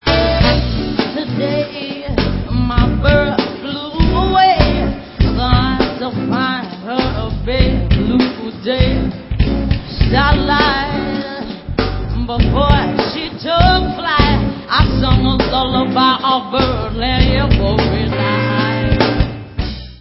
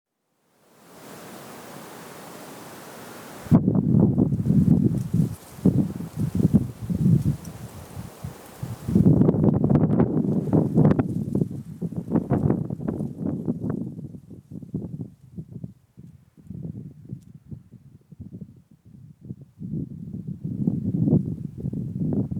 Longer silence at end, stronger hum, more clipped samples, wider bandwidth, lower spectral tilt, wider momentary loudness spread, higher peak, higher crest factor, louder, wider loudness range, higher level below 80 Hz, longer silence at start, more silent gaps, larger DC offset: about the same, 0.05 s vs 0 s; neither; neither; second, 5.8 kHz vs 19.5 kHz; about the same, -9.5 dB/octave vs -9.5 dB/octave; second, 9 LU vs 22 LU; first, 0 dBFS vs -6 dBFS; about the same, 14 dB vs 18 dB; first, -15 LUFS vs -23 LUFS; second, 3 LU vs 20 LU; first, -20 dBFS vs -46 dBFS; second, 0.05 s vs 0.95 s; neither; neither